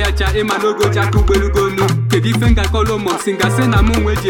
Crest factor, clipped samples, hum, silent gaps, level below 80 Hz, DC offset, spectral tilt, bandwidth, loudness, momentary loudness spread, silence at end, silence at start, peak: 14 dB; under 0.1%; none; none; -20 dBFS; under 0.1%; -5.5 dB/octave; 17.5 kHz; -14 LUFS; 3 LU; 0 s; 0 s; 0 dBFS